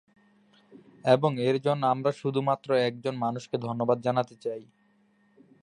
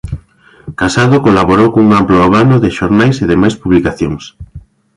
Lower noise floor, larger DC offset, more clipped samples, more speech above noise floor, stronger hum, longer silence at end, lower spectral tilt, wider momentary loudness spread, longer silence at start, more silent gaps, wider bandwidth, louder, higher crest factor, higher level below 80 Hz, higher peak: first, -65 dBFS vs -42 dBFS; neither; neither; first, 39 dB vs 34 dB; neither; first, 1 s vs 0.35 s; about the same, -7 dB/octave vs -7 dB/octave; second, 10 LU vs 17 LU; first, 0.75 s vs 0.05 s; neither; about the same, 10.5 kHz vs 11.5 kHz; second, -27 LUFS vs -9 LUFS; first, 22 dB vs 10 dB; second, -74 dBFS vs -32 dBFS; second, -6 dBFS vs 0 dBFS